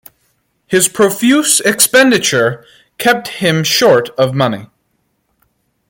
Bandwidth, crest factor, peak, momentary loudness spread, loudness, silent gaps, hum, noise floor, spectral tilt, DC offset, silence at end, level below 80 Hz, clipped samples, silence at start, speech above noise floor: 17 kHz; 14 dB; 0 dBFS; 8 LU; -11 LUFS; none; none; -64 dBFS; -3 dB/octave; under 0.1%; 1.25 s; -56 dBFS; under 0.1%; 0.7 s; 52 dB